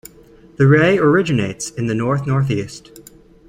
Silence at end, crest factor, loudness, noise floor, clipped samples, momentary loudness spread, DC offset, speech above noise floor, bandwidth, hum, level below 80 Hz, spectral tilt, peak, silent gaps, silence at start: 0.5 s; 16 dB; -16 LUFS; -45 dBFS; under 0.1%; 11 LU; under 0.1%; 29 dB; 15.5 kHz; none; -48 dBFS; -6.5 dB/octave; -2 dBFS; none; 0.6 s